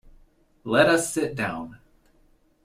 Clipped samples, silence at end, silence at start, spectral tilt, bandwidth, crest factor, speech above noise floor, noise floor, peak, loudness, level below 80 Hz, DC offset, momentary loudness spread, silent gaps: under 0.1%; 0.9 s; 0.65 s; -4 dB/octave; 16 kHz; 22 dB; 38 dB; -61 dBFS; -6 dBFS; -23 LUFS; -56 dBFS; under 0.1%; 21 LU; none